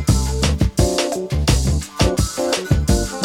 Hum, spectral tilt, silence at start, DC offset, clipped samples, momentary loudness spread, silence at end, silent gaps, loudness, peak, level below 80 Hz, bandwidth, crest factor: none; -5 dB/octave; 0 s; under 0.1%; under 0.1%; 3 LU; 0 s; none; -19 LUFS; -2 dBFS; -22 dBFS; 16.5 kHz; 16 dB